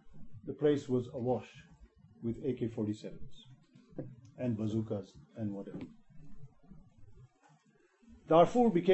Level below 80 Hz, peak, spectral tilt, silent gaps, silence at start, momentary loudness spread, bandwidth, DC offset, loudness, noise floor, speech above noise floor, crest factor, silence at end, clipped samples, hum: -62 dBFS; -12 dBFS; -8 dB/octave; none; 0.05 s; 23 LU; 8.4 kHz; under 0.1%; -33 LUFS; -68 dBFS; 36 dB; 22 dB; 0 s; under 0.1%; none